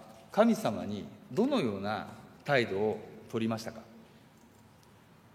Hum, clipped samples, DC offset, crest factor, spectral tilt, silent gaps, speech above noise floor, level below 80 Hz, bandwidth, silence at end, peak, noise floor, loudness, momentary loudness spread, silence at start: none; under 0.1%; under 0.1%; 22 dB; -6 dB/octave; none; 28 dB; -72 dBFS; 15.5 kHz; 1.35 s; -10 dBFS; -59 dBFS; -32 LUFS; 15 LU; 0 s